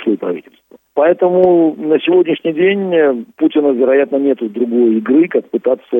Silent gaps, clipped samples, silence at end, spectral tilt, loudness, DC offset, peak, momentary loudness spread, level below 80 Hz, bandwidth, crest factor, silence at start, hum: none; under 0.1%; 0 s; -9 dB/octave; -13 LUFS; under 0.1%; 0 dBFS; 6 LU; -62 dBFS; 3.8 kHz; 12 dB; 0 s; none